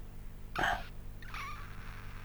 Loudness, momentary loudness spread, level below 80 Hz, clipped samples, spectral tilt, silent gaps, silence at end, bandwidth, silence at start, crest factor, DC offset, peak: -39 LUFS; 16 LU; -46 dBFS; under 0.1%; -4 dB/octave; none; 0 s; over 20 kHz; 0 s; 22 dB; under 0.1%; -16 dBFS